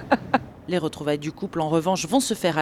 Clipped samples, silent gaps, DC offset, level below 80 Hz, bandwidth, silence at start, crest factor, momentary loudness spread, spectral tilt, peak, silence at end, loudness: under 0.1%; none; under 0.1%; -54 dBFS; 16.5 kHz; 0 s; 18 dB; 6 LU; -4.5 dB/octave; -6 dBFS; 0 s; -24 LUFS